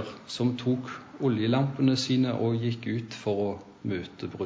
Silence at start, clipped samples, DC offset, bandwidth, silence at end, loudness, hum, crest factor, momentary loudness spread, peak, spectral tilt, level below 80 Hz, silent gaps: 0 s; under 0.1%; under 0.1%; 8 kHz; 0 s; -29 LUFS; none; 16 dB; 9 LU; -12 dBFS; -6.5 dB/octave; -60 dBFS; none